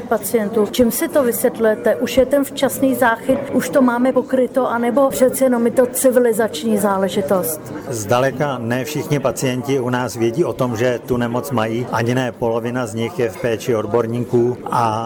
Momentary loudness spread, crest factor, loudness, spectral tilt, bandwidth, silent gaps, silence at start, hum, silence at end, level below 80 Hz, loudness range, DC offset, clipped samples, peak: 6 LU; 14 dB; -18 LUFS; -5.5 dB/octave; over 20 kHz; none; 0 s; none; 0 s; -50 dBFS; 4 LU; under 0.1%; under 0.1%; -4 dBFS